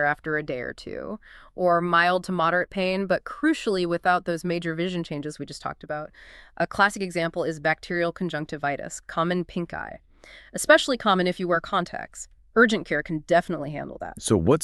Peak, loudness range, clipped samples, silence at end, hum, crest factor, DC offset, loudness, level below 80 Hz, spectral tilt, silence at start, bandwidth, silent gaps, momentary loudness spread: -4 dBFS; 5 LU; under 0.1%; 0 s; none; 22 dB; under 0.1%; -25 LUFS; -52 dBFS; -5 dB/octave; 0 s; 13.5 kHz; none; 15 LU